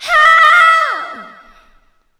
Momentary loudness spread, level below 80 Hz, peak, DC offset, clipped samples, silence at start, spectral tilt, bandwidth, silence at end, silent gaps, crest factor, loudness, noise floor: 17 LU; -50 dBFS; 0 dBFS; under 0.1%; 0.3%; 0 s; 1 dB/octave; 14 kHz; 0.9 s; none; 12 dB; -8 LUFS; -52 dBFS